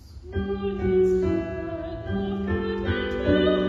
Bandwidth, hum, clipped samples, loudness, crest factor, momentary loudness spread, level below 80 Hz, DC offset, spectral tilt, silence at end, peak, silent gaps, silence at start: 7.4 kHz; none; under 0.1%; -26 LUFS; 16 dB; 11 LU; -38 dBFS; under 0.1%; -8 dB/octave; 0 s; -10 dBFS; none; 0.05 s